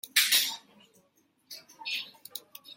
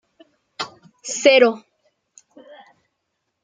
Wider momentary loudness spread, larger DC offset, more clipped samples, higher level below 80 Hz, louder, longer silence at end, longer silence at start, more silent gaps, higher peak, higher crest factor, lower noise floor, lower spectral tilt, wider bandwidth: about the same, 24 LU vs 22 LU; neither; neither; second, under -90 dBFS vs -76 dBFS; second, -27 LUFS vs -16 LUFS; second, 0.05 s vs 1.85 s; second, 0.05 s vs 0.6 s; neither; second, -8 dBFS vs -2 dBFS; about the same, 24 dB vs 20 dB; second, -69 dBFS vs -76 dBFS; second, 3.5 dB/octave vs -1.5 dB/octave; first, 16.5 kHz vs 9.6 kHz